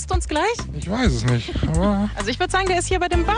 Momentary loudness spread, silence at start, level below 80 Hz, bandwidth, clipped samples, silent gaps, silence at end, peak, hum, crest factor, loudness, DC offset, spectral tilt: 4 LU; 0 s; -28 dBFS; 10.5 kHz; under 0.1%; none; 0 s; -4 dBFS; none; 16 dB; -21 LUFS; under 0.1%; -5 dB/octave